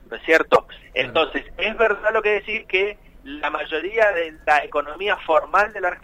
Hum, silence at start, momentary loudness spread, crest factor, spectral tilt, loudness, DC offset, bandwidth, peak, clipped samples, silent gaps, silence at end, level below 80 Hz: none; 0.1 s; 8 LU; 16 dB; -4 dB/octave; -21 LUFS; under 0.1%; 14.5 kHz; -4 dBFS; under 0.1%; none; 0.05 s; -48 dBFS